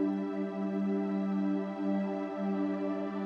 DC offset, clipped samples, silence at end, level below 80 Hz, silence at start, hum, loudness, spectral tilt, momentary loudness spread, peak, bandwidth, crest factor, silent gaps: under 0.1%; under 0.1%; 0 s; -76 dBFS; 0 s; none; -33 LUFS; -9.5 dB/octave; 3 LU; -20 dBFS; 6.4 kHz; 12 dB; none